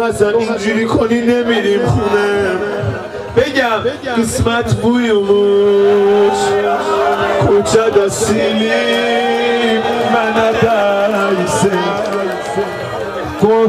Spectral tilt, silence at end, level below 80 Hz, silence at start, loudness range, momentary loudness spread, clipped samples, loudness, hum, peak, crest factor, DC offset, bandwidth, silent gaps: -5 dB/octave; 0 s; -40 dBFS; 0 s; 3 LU; 7 LU; under 0.1%; -13 LUFS; none; 0 dBFS; 12 dB; under 0.1%; 15 kHz; none